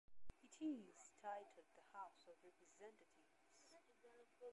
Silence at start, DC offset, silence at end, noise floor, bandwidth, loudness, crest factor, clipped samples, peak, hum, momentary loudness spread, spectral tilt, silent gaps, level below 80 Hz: 0.1 s; under 0.1%; 0 s; -74 dBFS; 11 kHz; -56 LUFS; 18 dB; under 0.1%; -40 dBFS; none; 17 LU; -4.5 dB/octave; none; -78 dBFS